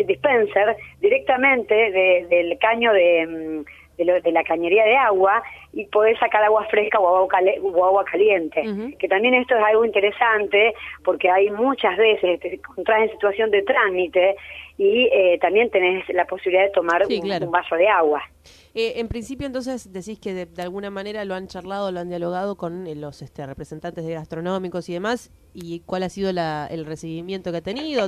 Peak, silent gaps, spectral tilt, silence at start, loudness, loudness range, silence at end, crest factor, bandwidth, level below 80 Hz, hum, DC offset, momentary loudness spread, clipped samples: -4 dBFS; none; -5.5 dB/octave; 0 s; -20 LUFS; 11 LU; 0 s; 16 dB; 12 kHz; -52 dBFS; none; under 0.1%; 14 LU; under 0.1%